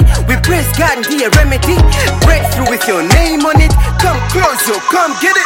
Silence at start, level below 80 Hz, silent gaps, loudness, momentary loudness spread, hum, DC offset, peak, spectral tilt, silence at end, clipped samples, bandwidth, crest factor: 0 s; -14 dBFS; none; -11 LUFS; 3 LU; none; under 0.1%; 0 dBFS; -4.5 dB/octave; 0 s; under 0.1%; 17 kHz; 10 dB